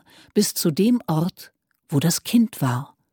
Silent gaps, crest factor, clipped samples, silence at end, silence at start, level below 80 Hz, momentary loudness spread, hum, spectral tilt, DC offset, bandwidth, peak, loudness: none; 16 dB; under 0.1%; 0.25 s; 0.35 s; -64 dBFS; 6 LU; none; -5 dB/octave; under 0.1%; 19 kHz; -6 dBFS; -22 LUFS